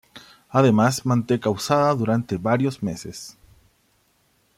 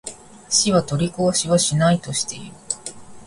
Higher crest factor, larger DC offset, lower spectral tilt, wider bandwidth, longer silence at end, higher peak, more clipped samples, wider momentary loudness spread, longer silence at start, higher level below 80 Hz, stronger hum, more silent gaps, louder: about the same, 18 dB vs 20 dB; neither; first, -6 dB/octave vs -4 dB/octave; first, 15.5 kHz vs 11.5 kHz; first, 1.25 s vs 0 s; about the same, -4 dBFS vs -2 dBFS; neither; about the same, 16 LU vs 14 LU; about the same, 0.15 s vs 0.05 s; second, -58 dBFS vs -50 dBFS; neither; neither; about the same, -21 LUFS vs -20 LUFS